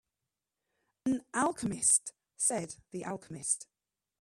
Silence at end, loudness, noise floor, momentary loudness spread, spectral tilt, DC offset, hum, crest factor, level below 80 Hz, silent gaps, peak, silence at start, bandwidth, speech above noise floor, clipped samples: 0.55 s; -31 LUFS; -89 dBFS; 15 LU; -3 dB/octave; under 0.1%; none; 22 dB; -70 dBFS; none; -12 dBFS; 1.05 s; 14 kHz; 56 dB; under 0.1%